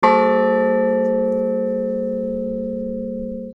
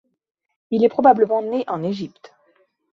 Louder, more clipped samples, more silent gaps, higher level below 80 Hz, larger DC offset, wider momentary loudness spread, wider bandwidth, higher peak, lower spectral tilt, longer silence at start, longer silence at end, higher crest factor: about the same, -20 LUFS vs -19 LUFS; neither; neither; first, -48 dBFS vs -66 dBFS; neither; second, 10 LU vs 13 LU; about the same, 6.2 kHz vs 6.8 kHz; about the same, 0 dBFS vs -2 dBFS; about the same, -8 dB/octave vs -8 dB/octave; second, 0 s vs 0.7 s; second, 0 s vs 0.9 s; about the same, 18 dB vs 18 dB